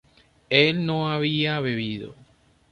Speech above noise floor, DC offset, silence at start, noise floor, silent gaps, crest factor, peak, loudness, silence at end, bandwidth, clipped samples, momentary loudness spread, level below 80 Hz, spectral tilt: 34 dB; under 0.1%; 0.5 s; -57 dBFS; none; 22 dB; -4 dBFS; -23 LUFS; 0.6 s; 6.8 kHz; under 0.1%; 13 LU; -60 dBFS; -7 dB/octave